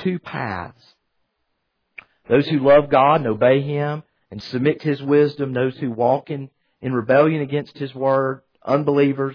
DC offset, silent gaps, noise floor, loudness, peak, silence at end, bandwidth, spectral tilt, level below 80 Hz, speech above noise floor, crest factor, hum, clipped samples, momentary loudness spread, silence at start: under 0.1%; none; -73 dBFS; -19 LUFS; -4 dBFS; 0 s; 5.4 kHz; -9 dB/octave; -56 dBFS; 54 dB; 16 dB; none; under 0.1%; 16 LU; 0 s